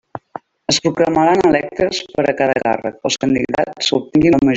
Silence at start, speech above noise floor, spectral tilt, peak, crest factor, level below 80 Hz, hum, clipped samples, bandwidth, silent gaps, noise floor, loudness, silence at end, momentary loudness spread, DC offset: 0.15 s; 20 dB; -4.5 dB/octave; -2 dBFS; 14 dB; -46 dBFS; none; under 0.1%; 8.4 kHz; none; -36 dBFS; -16 LUFS; 0 s; 8 LU; under 0.1%